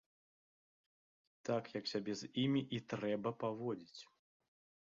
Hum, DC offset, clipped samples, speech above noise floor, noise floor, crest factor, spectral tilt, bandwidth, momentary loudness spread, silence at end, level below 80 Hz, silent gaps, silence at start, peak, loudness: none; under 0.1%; under 0.1%; over 50 dB; under -90 dBFS; 18 dB; -5 dB/octave; 7.4 kHz; 12 LU; 0.85 s; -80 dBFS; none; 1.45 s; -24 dBFS; -41 LUFS